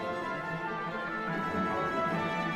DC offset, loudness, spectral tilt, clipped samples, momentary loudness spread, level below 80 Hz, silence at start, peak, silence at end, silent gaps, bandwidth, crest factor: under 0.1%; -33 LUFS; -6 dB/octave; under 0.1%; 4 LU; -62 dBFS; 0 s; -20 dBFS; 0 s; none; 15 kHz; 14 dB